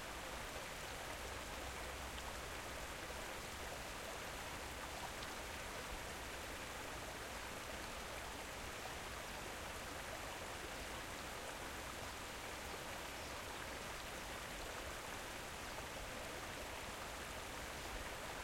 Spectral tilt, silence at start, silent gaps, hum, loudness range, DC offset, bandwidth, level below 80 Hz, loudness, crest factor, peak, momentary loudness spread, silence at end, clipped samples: -2.5 dB/octave; 0 s; none; none; 0 LU; under 0.1%; 16.5 kHz; -58 dBFS; -47 LUFS; 16 dB; -32 dBFS; 1 LU; 0 s; under 0.1%